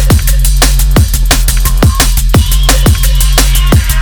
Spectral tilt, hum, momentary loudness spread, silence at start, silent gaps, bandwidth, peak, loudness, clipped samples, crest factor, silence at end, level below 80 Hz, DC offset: -4 dB/octave; none; 2 LU; 0 s; none; over 20 kHz; 0 dBFS; -9 LUFS; 0.5%; 6 dB; 0 s; -8 dBFS; under 0.1%